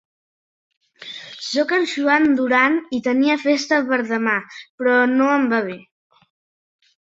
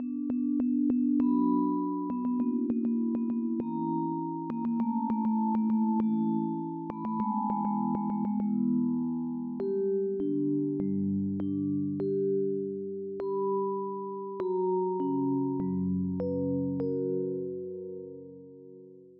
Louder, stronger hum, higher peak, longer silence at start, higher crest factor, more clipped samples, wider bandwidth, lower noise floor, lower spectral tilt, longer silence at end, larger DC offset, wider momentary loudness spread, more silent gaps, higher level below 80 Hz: first, -18 LUFS vs -30 LUFS; neither; first, -2 dBFS vs -16 dBFS; first, 1 s vs 0 s; about the same, 18 dB vs 14 dB; neither; first, 8 kHz vs 2.8 kHz; second, -38 dBFS vs -51 dBFS; second, -4 dB/octave vs -12 dB/octave; first, 1.25 s vs 0.05 s; neither; first, 17 LU vs 8 LU; first, 4.70-4.78 s vs none; about the same, -66 dBFS vs -68 dBFS